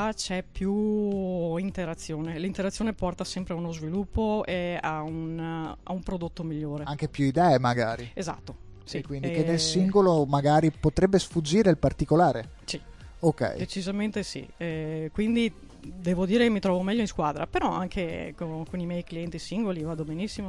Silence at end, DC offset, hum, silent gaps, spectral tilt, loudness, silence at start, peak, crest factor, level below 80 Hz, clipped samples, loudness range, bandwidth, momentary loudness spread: 0 s; under 0.1%; none; none; -6 dB/octave; -28 LUFS; 0 s; -8 dBFS; 20 dB; -46 dBFS; under 0.1%; 7 LU; 11.5 kHz; 13 LU